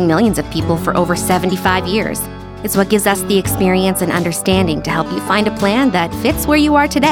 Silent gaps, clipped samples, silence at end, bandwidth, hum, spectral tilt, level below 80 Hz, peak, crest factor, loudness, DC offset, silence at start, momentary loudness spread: none; under 0.1%; 0 s; 19 kHz; none; -5 dB/octave; -34 dBFS; -2 dBFS; 14 dB; -15 LUFS; under 0.1%; 0 s; 6 LU